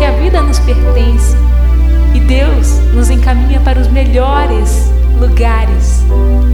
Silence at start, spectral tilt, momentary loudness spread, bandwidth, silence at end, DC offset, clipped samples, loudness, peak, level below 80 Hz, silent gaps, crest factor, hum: 0 s; -6.5 dB/octave; 1 LU; 12 kHz; 0 s; under 0.1%; under 0.1%; -10 LUFS; 0 dBFS; -8 dBFS; none; 8 dB; 60 Hz at -10 dBFS